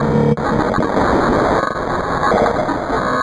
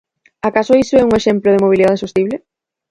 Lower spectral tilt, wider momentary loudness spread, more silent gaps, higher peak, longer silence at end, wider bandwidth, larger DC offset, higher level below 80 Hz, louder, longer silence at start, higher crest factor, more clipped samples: about the same, -7 dB/octave vs -6 dB/octave; second, 4 LU vs 9 LU; neither; second, -4 dBFS vs 0 dBFS; second, 0 s vs 0.55 s; about the same, 11 kHz vs 11 kHz; neither; first, -34 dBFS vs -44 dBFS; second, -16 LUFS vs -13 LUFS; second, 0 s vs 0.45 s; about the same, 12 dB vs 14 dB; neither